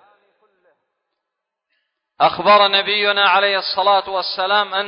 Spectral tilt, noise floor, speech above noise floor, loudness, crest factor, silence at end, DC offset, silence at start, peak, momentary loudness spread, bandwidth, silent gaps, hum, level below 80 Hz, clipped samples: -7 dB/octave; -80 dBFS; 65 dB; -15 LUFS; 18 dB; 0 s; under 0.1%; 2.2 s; 0 dBFS; 6 LU; 5.4 kHz; none; none; -64 dBFS; under 0.1%